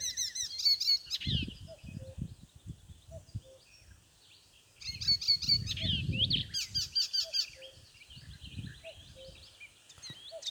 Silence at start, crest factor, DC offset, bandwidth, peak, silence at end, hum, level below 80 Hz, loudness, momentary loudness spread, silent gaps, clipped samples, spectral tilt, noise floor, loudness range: 0 s; 18 dB; under 0.1%; over 20 kHz; -18 dBFS; 0 s; none; -54 dBFS; -30 LUFS; 25 LU; none; under 0.1%; -2 dB/octave; -62 dBFS; 16 LU